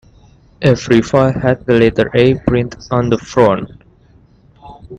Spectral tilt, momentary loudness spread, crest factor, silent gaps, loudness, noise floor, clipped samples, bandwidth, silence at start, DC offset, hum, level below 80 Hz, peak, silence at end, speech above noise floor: -7 dB/octave; 6 LU; 14 dB; none; -13 LUFS; -47 dBFS; under 0.1%; 8.6 kHz; 0.6 s; under 0.1%; none; -38 dBFS; 0 dBFS; 0 s; 35 dB